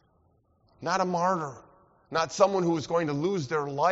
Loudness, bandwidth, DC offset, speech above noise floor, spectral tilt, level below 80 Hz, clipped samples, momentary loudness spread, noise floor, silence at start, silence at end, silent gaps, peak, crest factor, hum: -28 LUFS; 8 kHz; under 0.1%; 40 dB; -5 dB/octave; -66 dBFS; under 0.1%; 8 LU; -67 dBFS; 0.8 s; 0 s; none; -8 dBFS; 20 dB; none